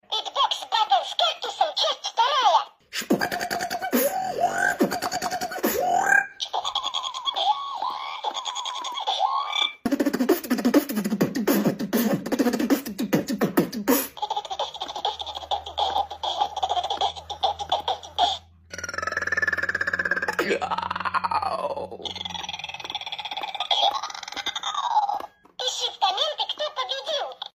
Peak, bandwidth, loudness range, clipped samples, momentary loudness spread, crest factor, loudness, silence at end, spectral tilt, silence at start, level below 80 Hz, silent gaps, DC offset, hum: -6 dBFS; 16 kHz; 4 LU; under 0.1%; 9 LU; 20 dB; -25 LUFS; 0.05 s; -3 dB/octave; 0.1 s; -60 dBFS; none; under 0.1%; none